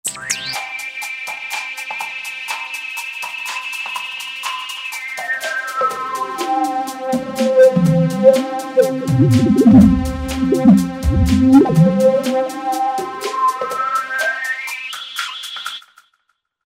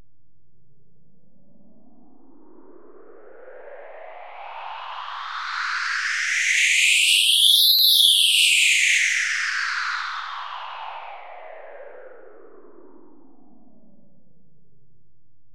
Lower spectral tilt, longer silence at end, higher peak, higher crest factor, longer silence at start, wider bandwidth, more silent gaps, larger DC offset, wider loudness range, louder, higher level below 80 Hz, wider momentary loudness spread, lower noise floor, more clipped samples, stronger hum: first, -6 dB/octave vs 4 dB/octave; second, 0.85 s vs 3.4 s; first, 0 dBFS vs -4 dBFS; about the same, 16 dB vs 20 dB; second, 0.05 s vs 3.4 s; about the same, 16 kHz vs 16 kHz; neither; second, under 0.1% vs 0.8%; second, 11 LU vs 23 LU; about the same, -17 LUFS vs -16 LUFS; first, -34 dBFS vs -78 dBFS; second, 13 LU vs 27 LU; about the same, -68 dBFS vs -67 dBFS; neither; neither